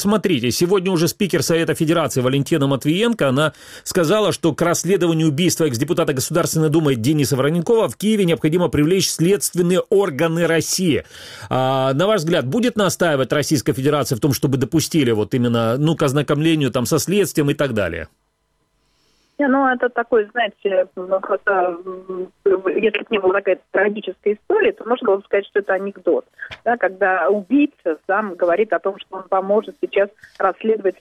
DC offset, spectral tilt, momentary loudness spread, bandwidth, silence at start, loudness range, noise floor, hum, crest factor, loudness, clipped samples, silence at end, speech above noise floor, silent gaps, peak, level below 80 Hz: under 0.1%; -5 dB/octave; 6 LU; 16.5 kHz; 0 s; 3 LU; -67 dBFS; none; 14 dB; -18 LUFS; under 0.1%; 0.1 s; 49 dB; none; -4 dBFS; -52 dBFS